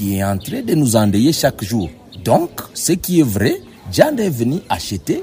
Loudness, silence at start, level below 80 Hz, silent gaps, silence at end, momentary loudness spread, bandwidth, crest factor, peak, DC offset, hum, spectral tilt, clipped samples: -17 LUFS; 0 s; -44 dBFS; none; 0 s; 8 LU; 16 kHz; 16 dB; 0 dBFS; under 0.1%; none; -5.5 dB/octave; under 0.1%